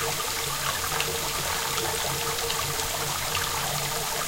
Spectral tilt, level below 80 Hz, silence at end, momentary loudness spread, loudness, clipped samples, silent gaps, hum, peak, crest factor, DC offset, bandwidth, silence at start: -1.5 dB/octave; -46 dBFS; 0 s; 1 LU; -26 LUFS; under 0.1%; none; none; -8 dBFS; 20 dB; under 0.1%; 16 kHz; 0 s